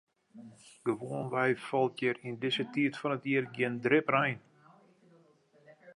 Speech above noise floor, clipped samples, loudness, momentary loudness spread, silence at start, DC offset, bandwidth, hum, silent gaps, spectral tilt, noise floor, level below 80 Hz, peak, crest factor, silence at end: 33 dB; under 0.1%; -32 LUFS; 8 LU; 0.35 s; under 0.1%; 11.5 kHz; none; none; -6 dB/octave; -64 dBFS; -80 dBFS; -12 dBFS; 20 dB; 0.05 s